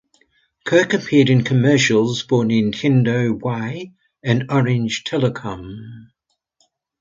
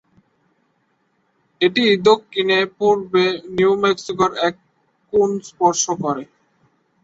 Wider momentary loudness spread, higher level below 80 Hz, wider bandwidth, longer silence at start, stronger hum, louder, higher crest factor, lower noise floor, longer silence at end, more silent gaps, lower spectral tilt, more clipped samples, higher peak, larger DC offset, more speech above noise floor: first, 17 LU vs 7 LU; about the same, -54 dBFS vs -58 dBFS; about the same, 7.6 kHz vs 8 kHz; second, 0.65 s vs 1.6 s; neither; about the same, -17 LUFS vs -18 LUFS; about the same, 18 dB vs 18 dB; about the same, -65 dBFS vs -65 dBFS; first, 1 s vs 0.8 s; neither; first, -6 dB/octave vs -3.5 dB/octave; neither; about the same, -2 dBFS vs -2 dBFS; neither; about the same, 48 dB vs 48 dB